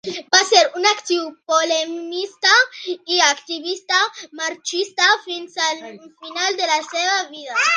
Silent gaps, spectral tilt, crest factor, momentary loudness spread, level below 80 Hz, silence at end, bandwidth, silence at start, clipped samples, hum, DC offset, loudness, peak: none; 0.5 dB/octave; 20 dB; 12 LU; -78 dBFS; 0 s; 10.5 kHz; 0.05 s; under 0.1%; none; under 0.1%; -18 LUFS; 0 dBFS